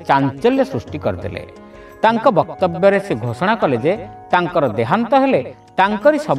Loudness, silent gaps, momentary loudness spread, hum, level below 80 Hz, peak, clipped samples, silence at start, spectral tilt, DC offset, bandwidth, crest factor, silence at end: -17 LUFS; none; 10 LU; none; -50 dBFS; 0 dBFS; under 0.1%; 0 s; -7 dB/octave; under 0.1%; 12.5 kHz; 16 dB; 0 s